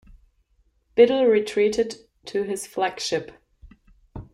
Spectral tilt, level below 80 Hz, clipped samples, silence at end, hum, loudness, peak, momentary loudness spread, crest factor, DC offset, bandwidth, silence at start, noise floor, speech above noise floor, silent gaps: -4 dB/octave; -54 dBFS; under 0.1%; 0.1 s; none; -22 LUFS; -4 dBFS; 23 LU; 20 dB; under 0.1%; 12.5 kHz; 0.95 s; -65 dBFS; 44 dB; none